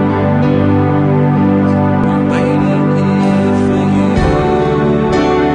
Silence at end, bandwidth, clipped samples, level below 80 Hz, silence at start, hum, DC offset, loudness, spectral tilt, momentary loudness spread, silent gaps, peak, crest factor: 0 s; 9.8 kHz; under 0.1%; -30 dBFS; 0 s; 50 Hz at -40 dBFS; under 0.1%; -12 LUFS; -8.5 dB/octave; 1 LU; none; 0 dBFS; 10 dB